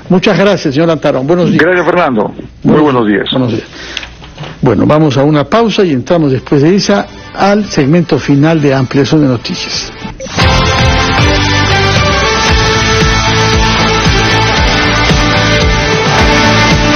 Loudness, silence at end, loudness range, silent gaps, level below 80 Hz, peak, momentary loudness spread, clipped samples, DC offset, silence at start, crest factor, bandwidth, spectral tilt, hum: -9 LUFS; 0 s; 3 LU; none; -22 dBFS; 0 dBFS; 7 LU; 0.4%; under 0.1%; 0 s; 8 dB; 10.5 kHz; -5 dB/octave; none